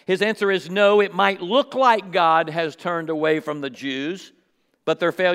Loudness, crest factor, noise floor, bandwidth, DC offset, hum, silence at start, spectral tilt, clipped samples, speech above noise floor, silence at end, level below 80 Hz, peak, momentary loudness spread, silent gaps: -21 LUFS; 20 dB; -66 dBFS; 15 kHz; under 0.1%; none; 0.1 s; -5 dB/octave; under 0.1%; 45 dB; 0 s; -80 dBFS; -2 dBFS; 11 LU; none